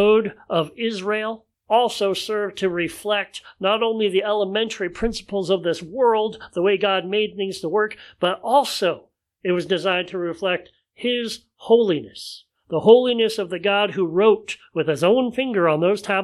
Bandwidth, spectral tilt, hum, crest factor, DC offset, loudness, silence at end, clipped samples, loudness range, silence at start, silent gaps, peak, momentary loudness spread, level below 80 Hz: 13.5 kHz; -5 dB/octave; none; 20 dB; under 0.1%; -21 LUFS; 0 s; under 0.1%; 4 LU; 0 s; none; 0 dBFS; 9 LU; -52 dBFS